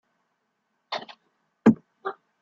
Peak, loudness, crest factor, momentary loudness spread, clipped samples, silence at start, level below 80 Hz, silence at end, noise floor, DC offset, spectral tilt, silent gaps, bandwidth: -4 dBFS; -26 LUFS; 24 dB; 15 LU; under 0.1%; 0.9 s; -64 dBFS; 0.3 s; -76 dBFS; under 0.1%; -7.5 dB/octave; none; 7.4 kHz